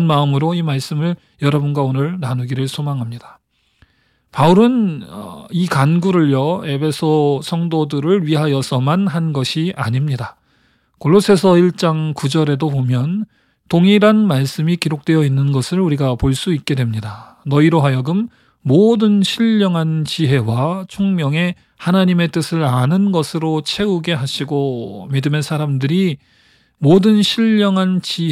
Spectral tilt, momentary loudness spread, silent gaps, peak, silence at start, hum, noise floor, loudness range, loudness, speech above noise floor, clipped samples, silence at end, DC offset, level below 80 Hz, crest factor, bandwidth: -7 dB/octave; 10 LU; none; -2 dBFS; 0 s; none; -58 dBFS; 3 LU; -16 LUFS; 43 dB; under 0.1%; 0 s; under 0.1%; -48 dBFS; 14 dB; 14 kHz